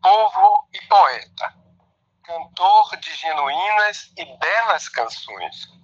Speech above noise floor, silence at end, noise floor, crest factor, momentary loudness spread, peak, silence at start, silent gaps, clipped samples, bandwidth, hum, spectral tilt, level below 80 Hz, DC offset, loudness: 39 dB; 0.2 s; -63 dBFS; 16 dB; 17 LU; -2 dBFS; 0.05 s; none; under 0.1%; 7.6 kHz; none; -0.5 dB/octave; -74 dBFS; under 0.1%; -18 LUFS